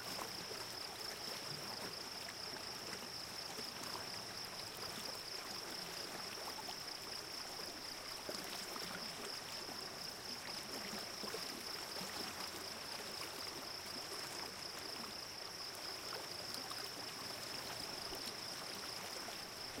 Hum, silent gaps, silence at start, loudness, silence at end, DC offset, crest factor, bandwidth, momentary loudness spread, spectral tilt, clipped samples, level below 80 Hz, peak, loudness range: none; none; 0 s; -45 LUFS; 0 s; under 0.1%; 20 dB; 16.5 kHz; 2 LU; -1.5 dB/octave; under 0.1%; -72 dBFS; -26 dBFS; 1 LU